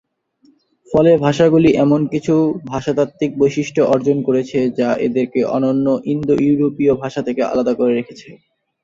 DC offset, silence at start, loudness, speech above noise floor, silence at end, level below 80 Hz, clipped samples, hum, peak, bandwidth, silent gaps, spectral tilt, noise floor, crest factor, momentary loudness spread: under 0.1%; 0.9 s; -16 LUFS; 40 dB; 0.5 s; -50 dBFS; under 0.1%; none; 0 dBFS; 7.6 kHz; none; -7.5 dB/octave; -55 dBFS; 16 dB; 7 LU